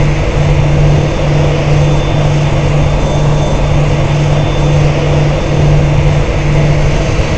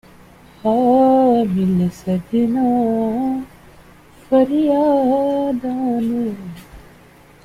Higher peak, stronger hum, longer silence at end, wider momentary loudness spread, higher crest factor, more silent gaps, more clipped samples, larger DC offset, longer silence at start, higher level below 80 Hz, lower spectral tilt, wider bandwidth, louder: first, 0 dBFS vs -6 dBFS; second, none vs 60 Hz at -45 dBFS; second, 0 s vs 0.65 s; second, 2 LU vs 11 LU; about the same, 10 dB vs 12 dB; neither; first, 0.1% vs under 0.1%; first, 6% vs under 0.1%; second, 0 s vs 0.65 s; first, -16 dBFS vs -50 dBFS; second, -7 dB/octave vs -8.5 dB/octave; second, 8.4 kHz vs 14.5 kHz; first, -11 LUFS vs -17 LUFS